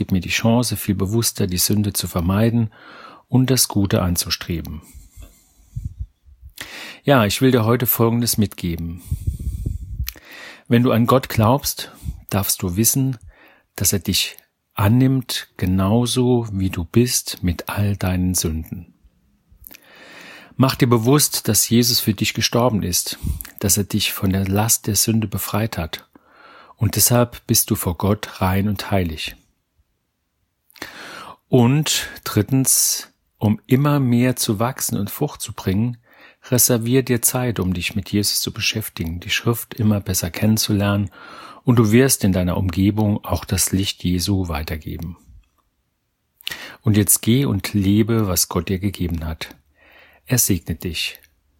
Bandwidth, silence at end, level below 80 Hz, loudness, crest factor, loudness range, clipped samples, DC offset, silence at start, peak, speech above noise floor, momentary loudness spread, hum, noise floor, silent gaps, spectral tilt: 17 kHz; 0.45 s; -40 dBFS; -19 LUFS; 20 dB; 5 LU; under 0.1%; under 0.1%; 0 s; 0 dBFS; 52 dB; 15 LU; none; -71 dBFS; none; -4.5 dB/octave